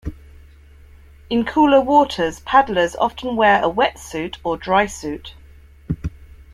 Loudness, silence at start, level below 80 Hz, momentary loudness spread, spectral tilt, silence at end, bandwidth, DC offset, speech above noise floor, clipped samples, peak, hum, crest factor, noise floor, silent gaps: -18 LUFS; 0.05 s; -40 dBFS; 15 LU; -5 dB/octave; 0.3 s; 14.5 kHz; under 0.1%; 27 dB; under 0.1%; -2 dBFS; none; 18 dB; -45 dBFS; none